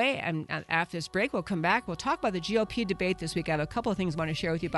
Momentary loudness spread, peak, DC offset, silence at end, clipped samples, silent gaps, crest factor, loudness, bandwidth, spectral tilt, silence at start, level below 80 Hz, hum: 4 LU; -12 dBFS; under 0.1%; 0 s; under 0.1%; none; 18 dB; -30 LUFS; 11.5 kHz; -5.5 dB/octave; 0 s; -52 dBFS; none